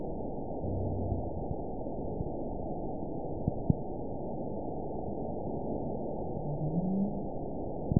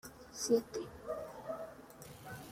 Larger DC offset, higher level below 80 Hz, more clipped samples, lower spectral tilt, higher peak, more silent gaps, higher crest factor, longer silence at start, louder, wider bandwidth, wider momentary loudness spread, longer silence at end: first, 0.9% vs under 0.1%; first, -46 dBFS vs -68 dBFS; neither; first, -5.5 dB/octave vs -4 dB/octave; first, -10 dBFS vs -18 dBFS; neither; about the same, 26 dB vs 22 dB; about the same, 0 s vs 0.05 s; first, -36 LUFS vs -40 LUFS; second, 1 kHz vs 16.5 kHz; second, 6 LU vs 18 LU; about the same, 0 s vs 0 s